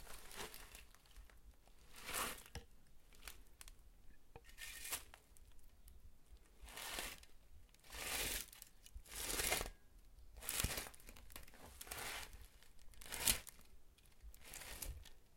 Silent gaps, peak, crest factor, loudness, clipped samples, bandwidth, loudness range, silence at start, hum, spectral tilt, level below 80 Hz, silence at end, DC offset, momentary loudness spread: none; -16 dBFS; 34 dB; -45 LUFS; under 0.1%; 17 kHz; 10 LU; 0 s; none; -1 dB/octave; -60 dBFS; 0 s; under 0.1%; 25 LU